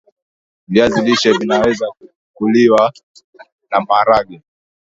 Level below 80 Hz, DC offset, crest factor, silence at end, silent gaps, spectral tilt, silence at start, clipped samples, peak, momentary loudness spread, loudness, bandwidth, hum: -50 dBFS; under 0.1%; 16 dB; 0.5 s; 2.16-2.34 s, 3.03-3.14 s, 3.24-3.33 s, 3.52-3.59 s; -5 dB/octave; 0.7 s; under 0.1%; 0 dBFS; 10 LU; -14 LUFS; 8 kHz; none